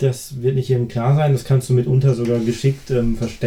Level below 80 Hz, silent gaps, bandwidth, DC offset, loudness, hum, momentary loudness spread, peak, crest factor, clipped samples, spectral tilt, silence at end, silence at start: -36 dBFS; none; 14 kHz; under 0.1%; -18 LUFS; none; 5 LU; -4 dBFS; 14 dB; under 0.1%; -7.5 dB/octave; 0 s; 0 s